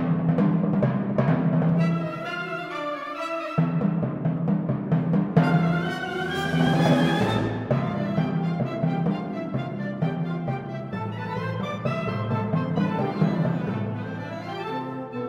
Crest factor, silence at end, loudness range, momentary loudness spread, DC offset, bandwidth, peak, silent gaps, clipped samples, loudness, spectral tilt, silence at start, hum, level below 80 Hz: 18 dB; 0 s; 5 LU; 9 LU; under 0.1%; 9.4 kHz; -6 dBFS; none; under 0.1%; -25 LUFS; -8 dB/octave; 0 s; none; -54 dBFS